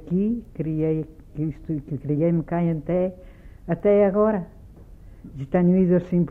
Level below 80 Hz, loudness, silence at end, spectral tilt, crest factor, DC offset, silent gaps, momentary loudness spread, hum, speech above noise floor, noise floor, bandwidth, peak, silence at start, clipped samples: -46 dBFS; -23 LUFS; 0 s; -11.5 dB/octave; 14 dB; under 0.1%; none; 13 LU; none; 22 dB; -44 dBFS; 3.3 kHz; -8 dBFS; 0 s; under 0.1%